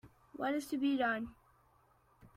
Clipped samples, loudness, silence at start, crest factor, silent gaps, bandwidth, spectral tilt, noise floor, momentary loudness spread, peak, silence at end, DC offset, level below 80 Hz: under 0.1%; -36 LUFS; 0.05 s; 16 dB; none; 15.5 kHz; -4.5 dB/octave; -70 dBFS; 14 LU; -22 dBFS; 0.1 s; under 0.1%; -70 dBFS